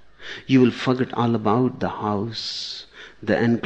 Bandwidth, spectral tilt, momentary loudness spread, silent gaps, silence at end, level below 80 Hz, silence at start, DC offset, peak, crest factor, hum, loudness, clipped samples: 8.2 kHz; -6.5 dB/octave; 17 LU; none; 0 s; -58 dBFS; 0 s; under 0.1%; -6 dBFS; 16 dB; none; -22 LUFS; under 0.1%